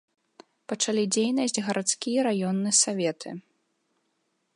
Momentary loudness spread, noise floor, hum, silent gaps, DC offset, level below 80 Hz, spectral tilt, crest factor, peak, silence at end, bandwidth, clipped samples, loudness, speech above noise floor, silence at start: 16 LU; -75 dBFS; none; none; under 0.1%; -80 dBFS; -3 dB/octave; 20 dB; -8 dBFS; 1.15 s; 11.5 kHz; under 0.1%; -25 LUFS; 49 dB; 0.7 s